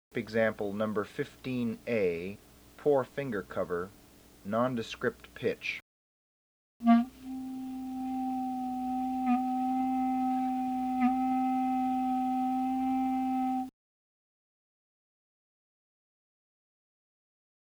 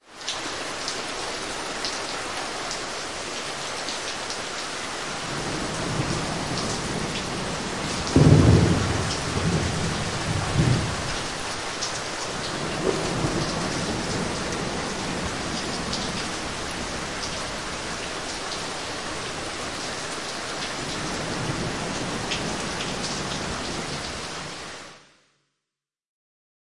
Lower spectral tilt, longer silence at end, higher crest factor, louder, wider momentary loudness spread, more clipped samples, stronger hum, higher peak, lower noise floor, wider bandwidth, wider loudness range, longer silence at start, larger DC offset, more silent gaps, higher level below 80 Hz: first, -6.5 dB/octave vs -4 dB/octave; first, 4 s vs 0.6 s; about the same, 22 dB vs 26 dB; second, -32 LUFS vs -26 LUFS; first, 10 LU vs 7 LU; neither; neither; second, -12 dBFS vs -2 dBFS; about the same, under -90 dBFS vs -87 dBFS; first, over 20 kHz vs 11.5 kHz; second, 5 LU vs 8 LU; first, 0.15 s vs 0 s; second, under 0.1% vs 0.4%; first, 5.82-6.80 s vs none; second, -64 dBFS vs -42 dBFS